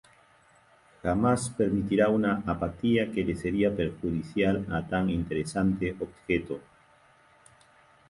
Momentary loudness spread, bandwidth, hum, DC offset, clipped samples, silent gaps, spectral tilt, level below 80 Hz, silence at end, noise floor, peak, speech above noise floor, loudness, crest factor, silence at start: 7 LU; 11.5 kHz; none; under 0.1%; under 0.1%; none; -6.5 dB/octave; -48 dBFS; 1.5 s; -60 dBFS; -10 dBFS; 33 dB; -28 LUFS; 18 dB; 1.05 s